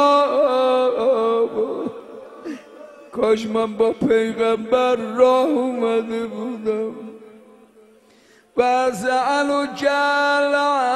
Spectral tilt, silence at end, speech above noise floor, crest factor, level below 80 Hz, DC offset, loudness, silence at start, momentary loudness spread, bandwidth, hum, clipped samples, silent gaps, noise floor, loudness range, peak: -4.5 dB/octave; 0 s; 34 dB; 16 dB; -62 dBFS; under 0.1%; -19 LUFS; 0 s; 16 LU; 12.5 kHz; none; under 0.1%; none; -53 dBFS; 5 LU; -2 dBFS